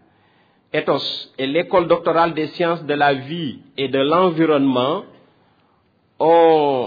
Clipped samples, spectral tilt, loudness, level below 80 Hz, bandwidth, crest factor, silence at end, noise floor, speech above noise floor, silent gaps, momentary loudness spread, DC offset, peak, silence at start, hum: under 0.1%; -7.5 dB/octave; -18 LUFS; -62 dBFS; 5 kHz; 16 dB; 0 s; -60 dBFS; 43 dB; none; 11 LU; under 0.1%; -4 dBFS; 0.75 s; none